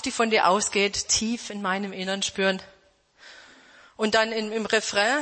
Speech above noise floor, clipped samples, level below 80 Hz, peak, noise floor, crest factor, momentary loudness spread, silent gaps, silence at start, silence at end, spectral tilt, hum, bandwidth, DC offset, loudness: 35 dB; under 0.1%; -58 dBFS; -6 dBFS; -60 dBFS; 20 dB; 9 LU; none; 0 s; 0 s; -2 dB/octave; none; 8.8 kHz; under 0.1%; -24 LUFS